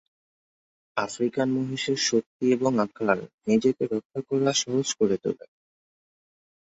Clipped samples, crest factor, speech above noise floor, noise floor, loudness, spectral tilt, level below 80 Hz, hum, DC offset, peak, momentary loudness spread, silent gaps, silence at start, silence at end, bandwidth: under 0.1%; 20 dB; over 65 dB; under -90 dBFS; -26 LUFS; -4 dB/octave; -68 dBFS; none; under 0.1%; -6 dBFS; 8 LU; 2.26-2.40 s, 3.34-3.38 s, 4.05-4.10 s; 0.95 s; 1.3 s; 8 kHz